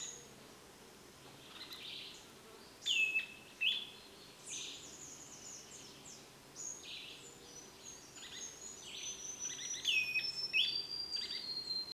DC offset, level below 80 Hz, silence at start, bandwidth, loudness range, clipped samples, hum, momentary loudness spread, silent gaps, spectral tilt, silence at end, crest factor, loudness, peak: under 0.1%; -76 dBFS; 0 s; 16 kHz; 12 LU; under 0.1%; none; 22 LU; none; 1 dB/octave; 0 s; 22 dB; -38 LUFS; -22 dBFS